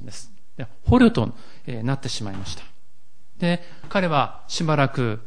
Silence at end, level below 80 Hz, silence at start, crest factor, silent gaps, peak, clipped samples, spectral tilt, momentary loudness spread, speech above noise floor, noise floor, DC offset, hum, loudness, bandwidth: 0.05 s; -42 dBFS; 0 s; 20 dB; none; -4 dBFS; under 0.1%; -6 dB/octave; 22 LU; 41 dB; -63 dBFS; 3%; none; -22 LUFS; 10.5 kHz